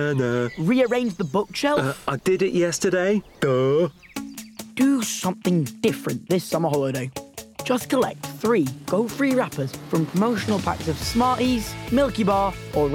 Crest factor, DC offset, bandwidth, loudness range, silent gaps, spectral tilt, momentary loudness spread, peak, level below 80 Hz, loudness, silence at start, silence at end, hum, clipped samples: 14 dB; under 0.1%; 18 kHz; 2 LU; none; -5.5 dB/octave; 8 LU; -8 dBFS; -46 dBFS; -23 LUFS; 0 s; 0 s; none; under 0.1%